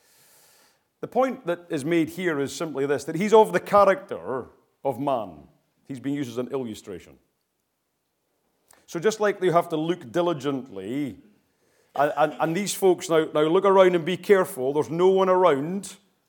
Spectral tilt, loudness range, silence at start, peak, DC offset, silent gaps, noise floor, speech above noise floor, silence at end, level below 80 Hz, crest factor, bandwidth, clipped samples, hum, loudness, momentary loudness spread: -5.5 dB/octave; 11 LU; 1.05 s; -4 dBFS; under 0.1%; none; -76 dBFS; 53 dB; 0.35 s; -68 dBFS; 20 dB; 19 kHz; under 0.1%; none; -23 LUFS; 15 LU